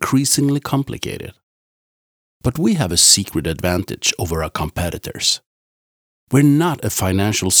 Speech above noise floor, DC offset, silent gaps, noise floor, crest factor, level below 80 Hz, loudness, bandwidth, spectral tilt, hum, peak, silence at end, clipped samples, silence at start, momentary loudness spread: over 73 dB; under 0.1%; 1.43-2.41 s, 5.46-6.27 s; under -90 dBFS; 18 dB; -40 dBFS; -17 LUFS; over 20 kHz; -3.5 dB/octave; none; 0 dBFS; 0 s; under 0.1%; 0 s; 13 LU